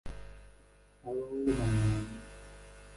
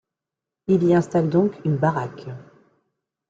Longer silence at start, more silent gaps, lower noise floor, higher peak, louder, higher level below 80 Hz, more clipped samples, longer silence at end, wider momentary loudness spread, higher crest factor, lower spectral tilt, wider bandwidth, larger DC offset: second, 0.05 s vs 0.7 s; neither; second, -61 dBFS vs -87 dBFS; second, -18 dBFS vs -6 dBFS; second, -33 LUFS vs -21 LUFS; first, -46 dBFS vs -60 dBFS; neither; second, 0 s vs 0.9 s; first, 22 LU vs 19 LU; about the same, 16 dB vs 16 dB; second, -7 dB/octave vs -9 dB/octave; first, 11.5 kHz vs 7.8 kHz; neither